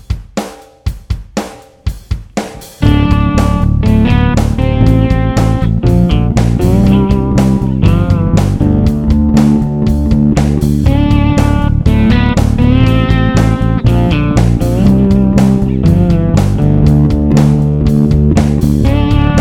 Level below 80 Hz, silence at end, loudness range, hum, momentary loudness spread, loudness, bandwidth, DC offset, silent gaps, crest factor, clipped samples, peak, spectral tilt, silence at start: -16 dBFS; 0 s; 3 LU; none; 11 LU; -10 LUFS; 15 kHz; under 0.1%; none; 10 dB; 0.7%; 0 dBFS; -8 dB/octave; 0.1 s